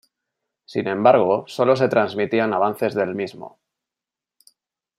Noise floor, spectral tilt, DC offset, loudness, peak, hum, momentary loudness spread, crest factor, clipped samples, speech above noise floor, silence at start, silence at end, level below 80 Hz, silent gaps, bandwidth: -88 dBFS; -6.5 dB/octave; under 0.1%; -20 LUFS; -2 dBFS; none; 13 LU; 20 dB; under 0.1%; 69 dB; 0.7 s; 1.5 s; -70 dBFS; none; 15 kHz